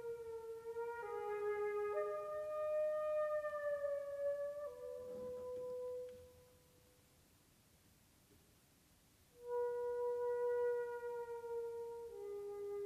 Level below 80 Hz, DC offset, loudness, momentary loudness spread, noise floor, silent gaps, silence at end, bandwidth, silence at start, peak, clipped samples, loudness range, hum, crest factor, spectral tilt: -78 dBFS; under 0.1%; -43 LUFS; 10 LU; -71 dBFS; none; 0 s; 15 kHz; 0 s; -30 dBFS; under 0.1%; 11 LU; none; 14 dB; -5 dB/octave